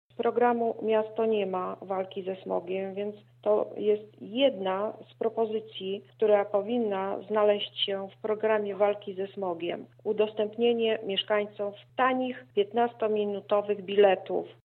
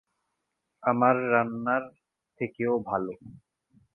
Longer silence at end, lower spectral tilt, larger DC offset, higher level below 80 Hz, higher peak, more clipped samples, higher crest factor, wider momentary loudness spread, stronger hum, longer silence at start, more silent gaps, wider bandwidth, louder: second, 0.1 s vs 0.6 s; second, -8 dB/octave vs -10 dB/octave; neither; second, -86 dBFS vs -68 dBFS; about the same, -8 dBFS vs -8 dBFS; neither; about the same, 20 dB vs 22 dB; second, 9 LU vs 14 LU; neither; second, 0.2 s vs 0.85 s; neither; first, 4.4 kHz vs 3.2 kHz; about the same, -29 LUFS vs -27 LUFS